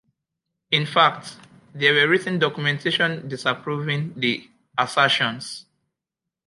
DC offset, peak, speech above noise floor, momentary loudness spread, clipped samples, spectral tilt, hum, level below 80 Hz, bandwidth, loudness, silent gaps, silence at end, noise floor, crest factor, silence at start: under 0.1%; -2 dBFS; 64 dB; 13 LU; under 0.1%; -4.5 dB/octave; none; -70 dBFS; 11.5 kHz; -21 LUFS; none; 0.85 s; -86 dBFS; 20 dB; 0.7 s